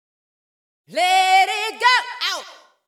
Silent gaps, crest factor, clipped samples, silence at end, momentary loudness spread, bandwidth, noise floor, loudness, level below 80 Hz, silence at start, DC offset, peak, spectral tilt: none; 18 dB; under 0.1%; 0.35 s; 11 LU; 16.5 kHz; -39 dBFS; -17 LUFS; -86 dBFS; 0.9 s; under 0.1%; -4 dBFS; 1 dB/octave